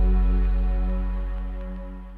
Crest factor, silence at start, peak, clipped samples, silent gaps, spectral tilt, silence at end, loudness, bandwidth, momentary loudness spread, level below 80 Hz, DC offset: 10 dB; 0 s; -12 dBFS; under 0.1%; none; -10 dB/octave; 0 s; -27 LUFS; 3.3 kHz; 12 LU; -22 dBFS; under 0.1%